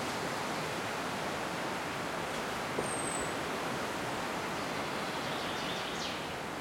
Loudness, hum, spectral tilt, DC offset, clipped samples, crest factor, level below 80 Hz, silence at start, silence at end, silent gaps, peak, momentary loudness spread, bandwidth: -35 LUFS; none; -3 dB/octave; under 0.1%; under 0.1%; 16 dB; -62 dBFS; 0 s; 0 s; none; -20 dBFS; 2 LU; 16.5 kHz